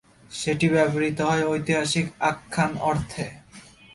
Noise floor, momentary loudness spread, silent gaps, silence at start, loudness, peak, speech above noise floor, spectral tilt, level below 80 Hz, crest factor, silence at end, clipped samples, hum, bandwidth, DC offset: -48 dBFS; 11 LU; none; 0.3 s; -24 LUFS; -8 dBFS; 25 dB; -5 dB/octave; -52 dBFS; 18 dB; 0.35 s; under 0.1%; none; 11.5 kHz; under 0.1%